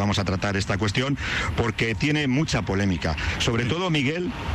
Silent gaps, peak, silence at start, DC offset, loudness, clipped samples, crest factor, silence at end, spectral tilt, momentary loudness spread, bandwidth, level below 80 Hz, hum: none; -12 dBFS; 0 s; under 0.1%; -24 LUFS; under 0.1%; 12 dB; 0 s; -5 dB/octave; 3 LU; 13 kHz; -38 dBFS; none